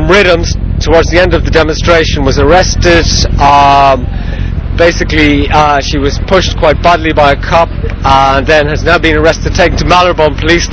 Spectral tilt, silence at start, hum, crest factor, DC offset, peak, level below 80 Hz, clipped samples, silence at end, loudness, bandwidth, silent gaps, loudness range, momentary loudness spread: -5 dB/octave; 0 s; none; 8 dB; 0.3%; 0 dBFS; -16 dBFS; 3%; 0 s; -8 LUFS; 8 kHz; none; 1 LU; 7 LU